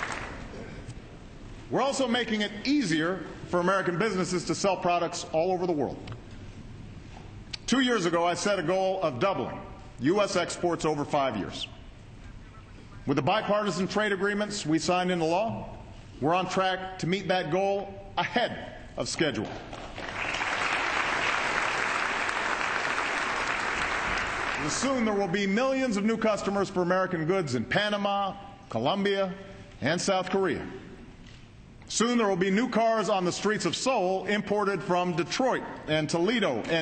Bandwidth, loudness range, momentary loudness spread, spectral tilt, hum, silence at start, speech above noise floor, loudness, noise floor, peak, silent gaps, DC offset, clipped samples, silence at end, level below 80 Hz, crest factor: 9 kHz; 3 LU; 16 LU; -4.5 dB/octave; none; 0 s; 22 dB; -28 LUFS; -49 dBFS; -12 dBFS; none; under 0.1%; under 0.1%; 0 s; -52 dBFS; 16 dB